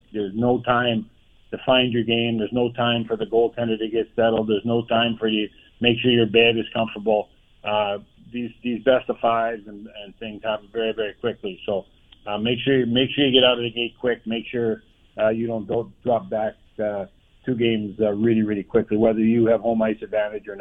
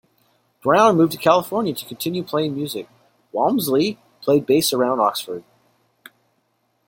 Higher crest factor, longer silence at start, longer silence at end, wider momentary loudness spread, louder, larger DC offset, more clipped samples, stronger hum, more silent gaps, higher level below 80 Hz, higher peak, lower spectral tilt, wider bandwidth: about the same, 20 dB vs 20 dB; second, 0.15 s vs 0.65 s; second, 0 s vs 1.5 s; about the same, 13 LU vs 13 LU; second, -22 LUFS vs -19 LUFS; neither; neither; neither; neither; first, -54 dBFS vs -64 dBFS; about the same, -2 dBFS vs -2 dBFS; first, -8.5 dB/octave vs -5 dB/octave; second, 3.8 kHz vs 17 kHz